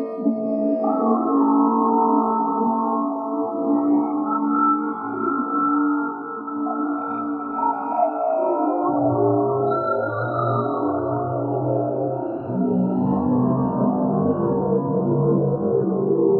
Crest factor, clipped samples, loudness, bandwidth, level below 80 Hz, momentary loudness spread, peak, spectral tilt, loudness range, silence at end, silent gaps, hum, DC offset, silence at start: 14 dB; under 0.1%; -21 LUFS; 4.2 kHz; -58 dBFS; 6 LU; -6 dBFS; -13.5 dB/octave; 3 LU; 0 s; none; none; under 0.1%; 0 s